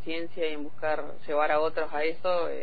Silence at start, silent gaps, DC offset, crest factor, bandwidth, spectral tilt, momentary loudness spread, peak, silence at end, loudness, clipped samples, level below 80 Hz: 0 s; none; 4%; 16 dB; 5 kHz; -7.5 dB/octave; 7 LU; -12 dBFS; 0 s; -30 LUFS; under 0.1%; -60 dBFS